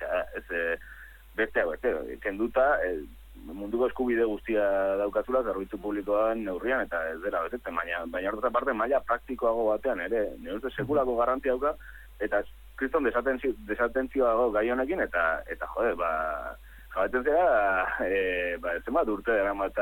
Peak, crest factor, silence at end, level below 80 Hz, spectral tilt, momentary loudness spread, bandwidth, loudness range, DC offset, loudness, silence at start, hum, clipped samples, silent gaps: -12 dBFS; 16 dB; 0 s; -50 dBFS; -6.5 dB/octave; 9 LU; 17.5 kHz; 2 LU; under 0.1%; -28 LUFS; 0 s; none; under 0.1%; none